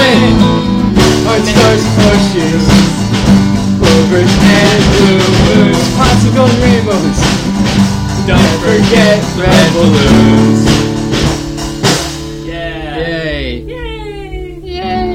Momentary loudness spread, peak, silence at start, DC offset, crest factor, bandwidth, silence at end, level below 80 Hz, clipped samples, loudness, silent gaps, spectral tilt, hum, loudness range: 13 LU; 0 dBFS; 0 s; under 0.1%; 8 dB; 16 kHz; 0 s; -22 dBFS; 1%; -9 LUFS; none; -5.5 dB/octave; none; 8 LU